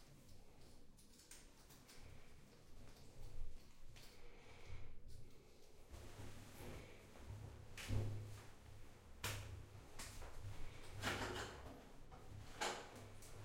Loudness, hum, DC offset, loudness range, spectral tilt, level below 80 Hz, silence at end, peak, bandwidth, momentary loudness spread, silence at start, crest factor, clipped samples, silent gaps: -53 LUFS; none; under 0.1%; 12 LU; -4 dB/octave; -58 dBFS; 0 s; -30 dBFS; 16.5 kHz; 20 LU; 0 s; 22 dB; under 0.1%; none